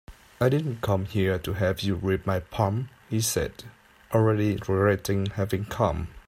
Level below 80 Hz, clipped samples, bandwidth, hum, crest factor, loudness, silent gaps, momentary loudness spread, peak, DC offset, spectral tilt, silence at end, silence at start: -48 dBFS; under 0.1%; 16 kHz; none; 18 dB; -26 LUFS; none; 6 LU; -8 dBFS; under 0.1%; -6 dB/octave; 0.05 s; 0.1 s